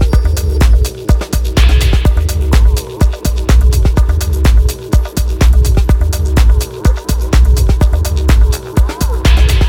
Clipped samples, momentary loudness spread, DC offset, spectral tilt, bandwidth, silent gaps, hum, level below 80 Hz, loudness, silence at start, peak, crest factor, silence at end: under 0.1%; 5 LU; under 0.1%; -5.5 dB/octave; 17 kHz; none; none; -10 dBFS; -12 LUFS; 0 s; 0 dBFS; 10 dB; 0 s